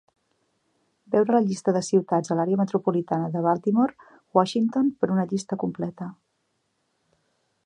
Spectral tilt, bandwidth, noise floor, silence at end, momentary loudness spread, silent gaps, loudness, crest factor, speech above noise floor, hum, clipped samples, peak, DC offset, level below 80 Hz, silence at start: -7 dB/octave; 10.5 kHz; -74 dBFS; 1.5 s; 8 LU; none; -24 LUFS; 20 dB; 50 dB; none; under 0.1%; -6 dBFS; under 0.1%; -72 dBFS; 1.1 s